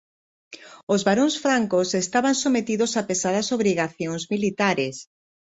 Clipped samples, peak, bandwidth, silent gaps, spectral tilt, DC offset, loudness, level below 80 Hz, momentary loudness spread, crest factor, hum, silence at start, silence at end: under 0.1%; -6 dBFS; 8.2 kHz; 0.83-0.87 s; -4 dB/octave; under 0.1%; -22 LUFS; -64 dBFS; 8 LU; 18 dB; none; 0.5 s; 0.55 s